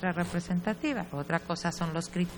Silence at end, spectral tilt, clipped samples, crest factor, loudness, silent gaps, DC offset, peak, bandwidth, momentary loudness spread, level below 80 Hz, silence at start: 0 s; -5.5 dB/octave; under 0.1%; 20 dB; -32 LUFS; none; under 0.1%; -12 dBFS; over 20 kHz; 3 LU; -56 dBFS; 0 s